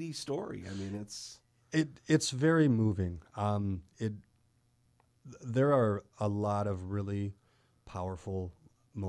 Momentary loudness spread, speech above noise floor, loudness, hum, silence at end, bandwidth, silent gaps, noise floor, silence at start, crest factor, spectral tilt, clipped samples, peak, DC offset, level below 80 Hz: 16 LU; 38 dB; -33 LUFS; none; 0 s; 11 kHz; none; -71 dBFS; 0 s; 18 dB; -6 dB/octave; under 0.1%; -14 dBFS; under 0.1%; -62 dBFS